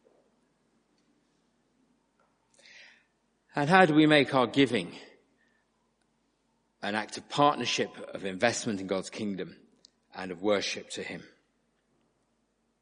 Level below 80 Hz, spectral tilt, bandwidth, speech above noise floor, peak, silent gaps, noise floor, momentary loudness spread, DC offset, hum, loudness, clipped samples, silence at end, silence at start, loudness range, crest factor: -74 dBFS; -4.5 dB/octave; 10 kHz; 47 dB; -4 dBFS; none; -75 dBFS; 19 LU; under 0.1%; none; -27 LUFS; under 0.1%; 1.6 s; 3.55 s; 9 LU; 28 dB